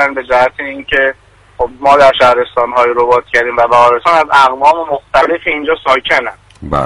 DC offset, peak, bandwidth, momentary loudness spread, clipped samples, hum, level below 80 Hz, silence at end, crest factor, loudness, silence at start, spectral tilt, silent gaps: under 0.1%; 0 dBFS; 11.5 kHz; 8 LU; 0.5%; none; -38 dBFS; 0 s; 10 dB; -10 LUFS; 0 s; -4 dB/octave; none